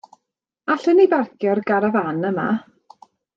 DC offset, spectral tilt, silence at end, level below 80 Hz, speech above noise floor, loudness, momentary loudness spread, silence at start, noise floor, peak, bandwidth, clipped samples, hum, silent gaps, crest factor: under 0.1%; -8 dB/octave; 0.75 s; -68 dBFS; 62 dB; -19 LUFS; 9 LU; 0.65 s; -80 dBFS; -4 dBFS; 7.2 kHz; under 0.1%; none; none; 16 dB